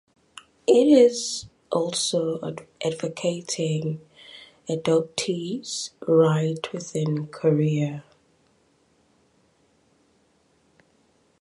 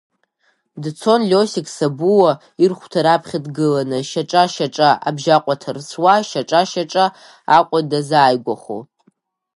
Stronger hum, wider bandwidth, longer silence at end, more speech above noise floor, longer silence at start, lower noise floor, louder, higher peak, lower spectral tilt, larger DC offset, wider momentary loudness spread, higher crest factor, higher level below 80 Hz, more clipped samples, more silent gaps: neither; about the same, 11.5 kHz vs 11.5 kHz; first, 3.4 s vs 0.7 s; second, 41 dB vs 48 dB; about the same, 0.7 s vs 0.75 s; about the same, -64 dBFS vs -64 dBFS; second, -24 LUFS vs -16 LUFS; second, -6 dBFS vs 0 dBFS; about the same, -5.5 dB/octave vs -5 dB/octave; neither; first, 14 LU vs 11 LU; about the same, 20 dB vs 16 dB; about the same, -68 dBFS vs -68 dBFS; neither; neither